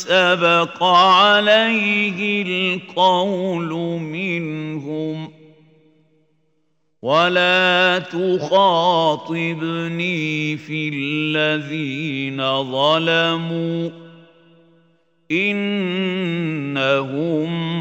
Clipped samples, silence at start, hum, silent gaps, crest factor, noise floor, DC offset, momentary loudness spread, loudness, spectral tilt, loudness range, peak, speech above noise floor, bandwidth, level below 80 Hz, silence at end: under 0.1%; 0 s; none; none; 18 dB; -69 dBFS; under 0.1%; 10 LU; -18 LUFS; -5.5 dB/octave; 8 LU; -2 dBFS; 51 dB; 16 kHz; -72 dBFS; 0 s